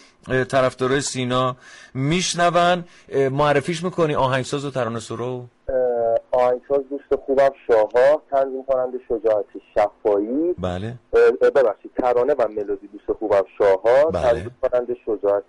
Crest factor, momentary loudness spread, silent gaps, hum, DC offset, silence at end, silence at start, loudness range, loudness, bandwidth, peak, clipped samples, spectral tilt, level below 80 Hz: 12 dB; 10 LU; none; none; under 0.1%; 0.05 s; 0.25 s; 2 LU; -20 LUFS; 11.5 kHz; -8 dBFS; under 0.1%; -5 dB/octave; -48 dBFS